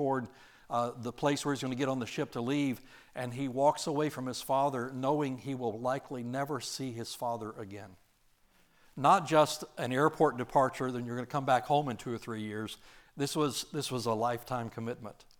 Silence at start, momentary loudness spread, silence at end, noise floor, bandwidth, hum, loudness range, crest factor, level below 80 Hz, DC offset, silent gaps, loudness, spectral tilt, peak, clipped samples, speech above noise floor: 0 s; 12 LU; 0.25 s; -68 dBFS; over 20 kHz; none; 6 LU; 20 dB; -66 dBFS; under 0.1%; none; -33 LUFS; -5 dB/octave; -12 dBFS; under 0.1%; 35 dB